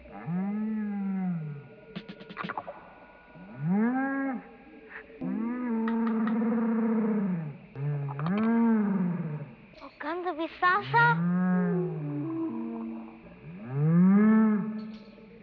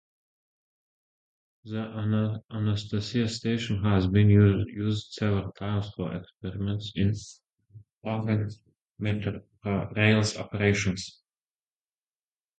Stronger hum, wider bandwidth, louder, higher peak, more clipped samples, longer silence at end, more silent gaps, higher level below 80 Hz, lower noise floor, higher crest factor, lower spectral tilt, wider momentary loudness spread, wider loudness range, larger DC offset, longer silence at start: neither; second, 5 kHz vs 9 kHz; about the same, -28 LUFS vs -28 LUFS; second, -12 dBFS vs -6 dBFS; neither; second, 0 s vs 1.5 s; second, none vs 2.44-2.49 s, 7.52-7.56 s, 7.93-8.01 s, 8.91-8.95 s; second, -66 dBFS vs -48 dBFS; second, -52 dBFS vs under -90 dBFS; about the same, 18 dB vs 22 dB; first, -10.5 dB/octave vs -6.5 dB/octave; first, 21 LU vs 14 LU; about the same, 7 LU vs 7 LU; neither; second, 0 s vs 1.65 s